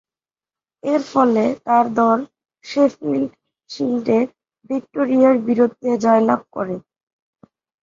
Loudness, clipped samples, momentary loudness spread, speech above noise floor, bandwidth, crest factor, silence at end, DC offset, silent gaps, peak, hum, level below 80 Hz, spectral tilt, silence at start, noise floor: -18 LUFS; under 0.1%; 12 LU; over 73 dB; 7.6 kHz; 18 dB; 1.05 s; under 0.1%; none; -2 dBFS; none; -64 dBFS; -6.5 dB/octave; 0.85 s; under -90 dBFS